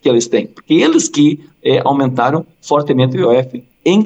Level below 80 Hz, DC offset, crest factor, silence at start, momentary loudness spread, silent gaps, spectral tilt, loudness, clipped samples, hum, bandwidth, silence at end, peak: -64 dBFS; under 0.1%; 12 dB; 0.05 s; 7 LU; none; -5.5 dB/octave; -14 LUFS; under 0.1%; none; 9 kHz; 0 s; -2 dBFS